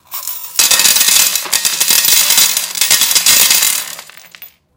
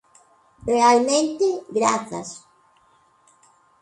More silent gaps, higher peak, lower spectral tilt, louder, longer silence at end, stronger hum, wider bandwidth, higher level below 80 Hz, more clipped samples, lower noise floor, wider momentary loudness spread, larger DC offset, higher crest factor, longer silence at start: neither; first, 0 dBFS vs -4 dBFS; second, 2.5 dB/octave vs -3 dB/octave; first, -8 LUFS vs -20 LUFS; second, 0.3 s vs 1.45 s; neither; first, over 20 kHz vs 11 kHz; first, -54 dBFS vs -60 dBFS; first, 0.6% vs under 0.1%; second, -38 dBFS vs -59 dBFS; second, 11 LU vs 18 LU; neither; second, 12 dB vs 20 dB; second, 0.1 s vs 0.65 s